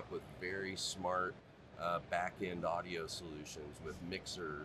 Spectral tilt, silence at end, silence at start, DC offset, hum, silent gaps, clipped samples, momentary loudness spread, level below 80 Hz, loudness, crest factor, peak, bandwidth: -3.5 dB/octave; 0 s; 0 s; under 0.1%; none; none; under 0.1%; 10 LU; -66 dBFS; -42 LUFS; 20 dB; -24 dBFS; 13.5 kHz